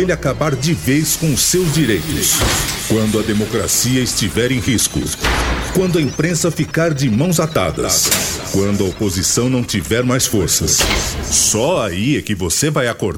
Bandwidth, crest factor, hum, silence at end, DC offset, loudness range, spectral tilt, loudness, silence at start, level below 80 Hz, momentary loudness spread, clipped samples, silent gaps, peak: 17.5 kHz; 16 dB; none; 0 s; under 0.1%; 1 LU; -3.5 dB/octave; -15 LUFS; 0 s; -30 dBFS; 5 LU; under 0.1%; none; 0 dBFS